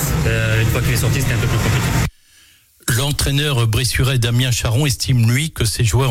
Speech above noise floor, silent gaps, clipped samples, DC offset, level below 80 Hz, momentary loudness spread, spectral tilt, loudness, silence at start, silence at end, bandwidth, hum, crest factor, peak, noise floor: 34 dB; none; under 0.1%; under 0.1%; -30 dBFS; 3 LU; -4.5 dB/octave; -17 LUFS; 0 s; 0 s; 17 kHz; none; 10 dB; -6 dBFS; -50 dBFS